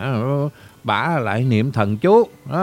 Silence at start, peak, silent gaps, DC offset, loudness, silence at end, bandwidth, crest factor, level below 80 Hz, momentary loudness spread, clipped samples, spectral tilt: 0 s; -2 dBFS; none; under 0.1%; -19 LUFS; 0 s; 15.5 kHz; 16 dB; -58 dBFS; 8 LU; under 0.1%; -8 dB/octave